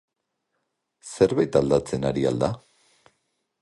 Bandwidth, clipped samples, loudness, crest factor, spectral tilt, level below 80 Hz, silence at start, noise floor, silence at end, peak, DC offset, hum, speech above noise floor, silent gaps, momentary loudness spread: 11.5 kHz; under 0.1%; -23 LUFS; 20 dB; -6.5 dB/octave; -52 dBFS; 1.05 s; -78 dBFS; 1.05 s; -4 dBFS; under 0.1%; none; 56 dB; none; 11 LU